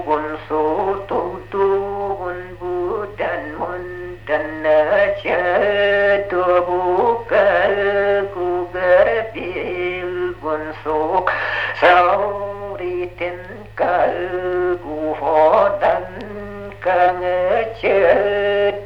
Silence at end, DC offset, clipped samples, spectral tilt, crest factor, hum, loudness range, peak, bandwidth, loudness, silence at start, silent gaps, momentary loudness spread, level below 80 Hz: 0 s; under 0.1%; under 0.1%; -7 dB/octave; 18 dB; none; 5 LU; 0 dBFS; 6.4 kHz; -18 LUFS; 0 s; none; 12 LU; -44 dBFS